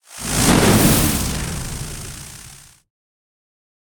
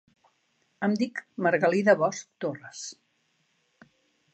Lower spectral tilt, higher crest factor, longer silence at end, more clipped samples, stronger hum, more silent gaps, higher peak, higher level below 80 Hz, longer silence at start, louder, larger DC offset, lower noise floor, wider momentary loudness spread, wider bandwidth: second, -4 dB/octave vs -5.5 dB/octave; about the same, 20 dB vs 22 dB; about the same, 1.3 s vs 1.4 s; neither; neither; neither; first, -2 dBFS vs -8 dBFS; first, -32 dBFS vs -82 dBFS; second, 0.1 s vs 0.8 s; first, -16 LUFS vs -26 LUFS; neither; second, -42 dBFS vs -72 dBFS; first, 21 LU vs 17 LU; first, 19.5 kHz vs 8.8 kHz